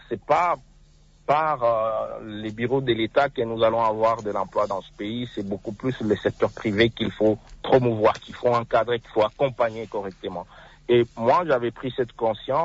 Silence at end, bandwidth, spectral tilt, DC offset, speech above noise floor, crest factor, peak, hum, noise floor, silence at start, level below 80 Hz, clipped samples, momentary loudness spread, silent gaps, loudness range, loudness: 0 s; 8 kHz; -7 dB/octave; under 0.1%; 30 dB; 16 dB; -8 dBFS; none; -54 dBFS; 0.1 s; -52 dBFS; under 0.1%; 11 LU; none; 2 LU; -24 LUFS